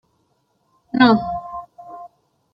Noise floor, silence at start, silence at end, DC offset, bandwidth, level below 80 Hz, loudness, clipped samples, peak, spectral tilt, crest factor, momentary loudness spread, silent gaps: -66 dBFS; 0.95 s; 0.45 s; under 0.1%; 5.8 kHz; -52 dBFS; -18 LUFS; under 0.1%; -2 dBFS; -7.5 dB/octave; 20 dB; 24 LU; none